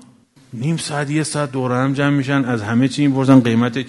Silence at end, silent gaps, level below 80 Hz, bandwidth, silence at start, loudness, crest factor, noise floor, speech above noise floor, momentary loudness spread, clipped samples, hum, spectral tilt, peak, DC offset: 0 s; none; -58 dBFS; 11.5 kHz; 0.5 s; -17 LUFS; 18 dB; -49 dBFS; 32 dB; 9 LU; under 0.1%; none; -6 dB/octave; 0 dBFS; under 0.1%